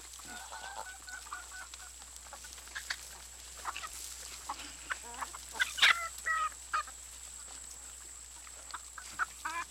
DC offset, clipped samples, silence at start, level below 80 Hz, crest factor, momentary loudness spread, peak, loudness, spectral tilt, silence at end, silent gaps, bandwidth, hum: under 0.1%; under 0.1%; 0 s; -60 dBFS; 24 dB; 14 LU; -14 dBFS; -37 LUFS; 1 dB/octave; 0 s; none; 16 kHz; none